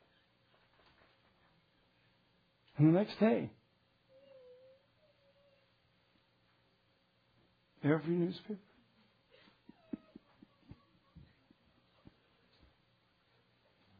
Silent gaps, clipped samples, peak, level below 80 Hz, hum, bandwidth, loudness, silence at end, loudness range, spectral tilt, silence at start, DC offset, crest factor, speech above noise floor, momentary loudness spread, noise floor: none; under 0.1%; -18 dBFS; -76 dBFS; none; 5 kHz; -34 LUFS; 4.05 s; 21 LU; -7.5 dB/octave; 2.75 s; under 0.1%; 24 dB; 43 dB; 21 LU; -74 dBFS